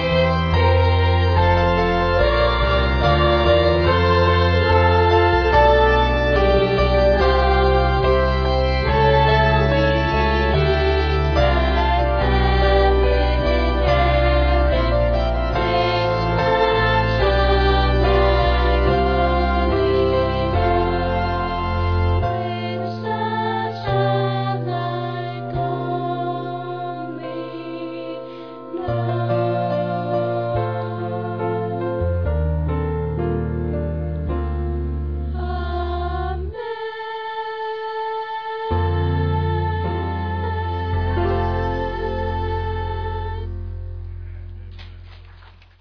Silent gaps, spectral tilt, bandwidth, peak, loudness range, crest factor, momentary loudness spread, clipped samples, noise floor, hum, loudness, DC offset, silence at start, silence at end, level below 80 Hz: none; -8 dB/octave; 5.4 kHz; -2 dBFS; 10 LU; 16 dB; 12 LU; under 0.1%; -45 dBFS; none; -19 LUFS; 0.4%; 0 s; 0.3 s; -24 dBFS